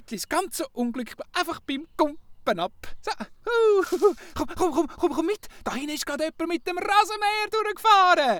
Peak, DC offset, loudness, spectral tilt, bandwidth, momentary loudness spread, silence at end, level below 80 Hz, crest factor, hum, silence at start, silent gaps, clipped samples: -6 dBFS; under 0.1%; -25 LUFS; -3 dB/octave; over 20 kHz; 12 LU; 0 s; -52 dBFS; 18 dB; none; 0 s; none; under 0.1%